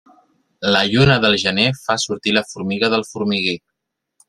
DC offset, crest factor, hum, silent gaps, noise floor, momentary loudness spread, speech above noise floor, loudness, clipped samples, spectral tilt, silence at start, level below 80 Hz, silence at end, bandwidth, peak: under 0.1%; 18 dB; none; none; -78 dBFS; 9 LU; 61 dB; -17 LUFS; under 0.1%; -4.5 dB/octave; 0.6 s; -46 dBFS; 0.7 s; 13 kHz; -2 dBFS